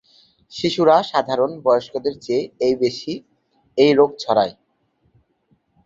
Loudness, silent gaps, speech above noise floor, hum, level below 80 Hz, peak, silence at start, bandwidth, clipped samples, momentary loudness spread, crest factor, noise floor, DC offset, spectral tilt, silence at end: -19 LUFS; none; 47 dB; none; -62 dBFS; -2 dBFS; 0.5 s; 7.8 kHz; under 0.1%; 13 LU; 18 dB; -65 dBFS; under 0.1%; -5.5 dB/octave; 1.35 s